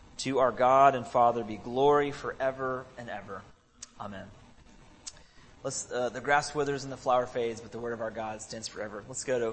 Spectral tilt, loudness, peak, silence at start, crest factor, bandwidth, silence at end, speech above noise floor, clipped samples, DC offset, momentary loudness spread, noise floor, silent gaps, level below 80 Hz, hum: -4 dB/octave; -29 LUFS; -8 dBFS; 0.15 s; 22 dB; 8.8 kHz; 0 s; 26 dB; under 0.1%; under 0.1%; 20 LU; -55 dBFS; none; -60 dBFS; none